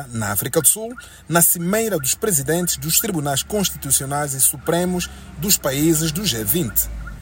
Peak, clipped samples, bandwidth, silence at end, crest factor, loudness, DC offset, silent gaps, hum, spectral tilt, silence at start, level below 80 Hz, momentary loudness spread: 0 dBFS; under 0.1%; 16.5 kHz; 0 s; 20 dB; -18 LUFS; under 0.1%; none; none; -3 dB/octave; 0 s; -40 dBFS; 8 LU